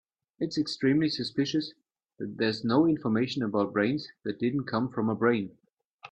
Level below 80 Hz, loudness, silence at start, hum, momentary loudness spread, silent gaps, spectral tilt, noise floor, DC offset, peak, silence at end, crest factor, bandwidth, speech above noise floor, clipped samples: -68 dBFS; -28 LUFS; 0.4 s; none; 11 LU; 5.73-5.77 s, 5.85-5.99 s; -6.5 dB/octave; -53 dBFS; under 0.1%; -10 dBFS; 0.05 s; 18 dB; 9 kHz; 26 dB; under 0.1%